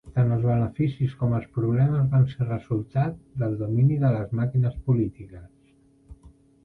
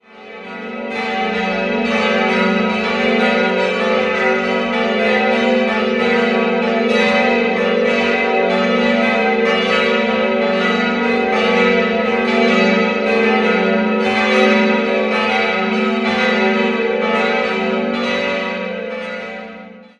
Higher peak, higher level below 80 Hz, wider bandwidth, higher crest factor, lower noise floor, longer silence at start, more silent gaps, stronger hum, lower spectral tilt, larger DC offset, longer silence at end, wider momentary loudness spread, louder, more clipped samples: second, -10 dBFS vs 0 dBFS; about the same, -48 dBFS vs -52 dBFS; second, 4.1 kHz vs 9.2 kHz; about the same, 14 dB vs 16 dB; first, -59 dBFS vs -36 dBFS; about the same, 0.05 s vs 0.15 s; neither; neither; first, -11 dB/octave vs -5.5 dB/octave; neither; first, 0.35 s vs 0.2 s; about the same, 8 LU vs 8 LU; second, -24 LUFS vs -15 LUFS; neither